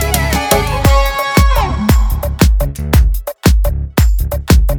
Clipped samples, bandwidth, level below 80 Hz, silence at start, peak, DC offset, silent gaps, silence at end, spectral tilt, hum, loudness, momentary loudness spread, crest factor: 0.1%; over 20 kHz; -14 dBFS; 0 s; 0 dBFS; under 0.1%; none; 0 s; -5 dB/octave; none; -13 LUFS; 4 LU; 12 dB